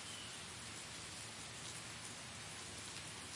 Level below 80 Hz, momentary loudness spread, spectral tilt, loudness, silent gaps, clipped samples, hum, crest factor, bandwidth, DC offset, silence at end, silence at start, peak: -72 dBFS; 1 LU; -1.5 dB/octave; -48 LUFS; none; under 0.1%; none; 18 dB; 11.5 kHz; under 0.1%; 0 s; 0 s; -32 dBFS